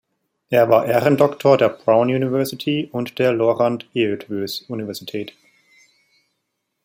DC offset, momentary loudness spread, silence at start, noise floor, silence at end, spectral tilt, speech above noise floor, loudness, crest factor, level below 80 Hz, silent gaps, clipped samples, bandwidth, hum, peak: under 0.1%; 13 LU; 0.5 s; -75 dBFS; 1.55 s; -6.5 dB/octave; 57 dB; -19 LUFS; 18 dB; -64 dBFS; none; under 0.1%; 16.5 kHz; none; -2 dBFS